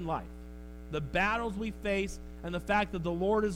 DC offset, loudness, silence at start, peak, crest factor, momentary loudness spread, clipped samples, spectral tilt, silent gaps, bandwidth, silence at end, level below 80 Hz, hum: under 0.1%; -33 LUFS; 0 s; -16 dBFS; 16 dB; 17 LU; under 0.1%; -6 dB/octave; none; 16 kHz; 0 s; -46 dBFS; none